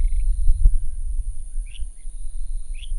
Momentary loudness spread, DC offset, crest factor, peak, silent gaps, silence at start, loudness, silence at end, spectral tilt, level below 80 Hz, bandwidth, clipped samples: 15 LU; under 0.1%; 16 dB; -2 dBFS; none; 0 s; -29 LUFS; 0 s; -4.5 dB/octave; -20 dBFS; 10.5 kHz; under 0.1%